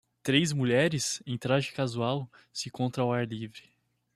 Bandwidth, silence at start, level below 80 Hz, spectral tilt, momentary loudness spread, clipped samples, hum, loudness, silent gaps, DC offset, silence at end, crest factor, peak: 14 kHz; 0.25 s; -68 dBFS; -4.5 dB/octave; 12 LU; under 0.1%; none; -29 LUFS; none; under 0.1%; 0.55 s; 20 dB; -10 dBFS